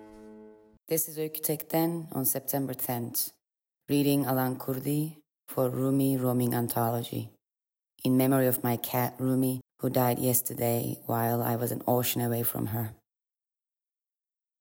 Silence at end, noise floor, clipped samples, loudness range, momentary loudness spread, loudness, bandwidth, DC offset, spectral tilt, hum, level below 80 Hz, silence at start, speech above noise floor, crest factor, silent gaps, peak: 1.65 s; -90 dBFS; under 0.1%; 3 LU; 7 LU; -29 LUFS; 17 kHz; under 0.1%; -5.5 dB/octave; none; -72 dBFS; 0 s; 62 dB; 18 dB; none; -12 dBFS